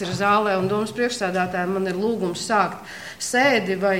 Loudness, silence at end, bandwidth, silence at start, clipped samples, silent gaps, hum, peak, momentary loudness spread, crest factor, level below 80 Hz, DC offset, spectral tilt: -22 LUFS; 0 s; 16.5 kHz; 0 s; under 0.1%; none; none; -4 dBFS; 7 LU; 18 dB; -58 dBFS; 0.2%; -4.5 dB/octave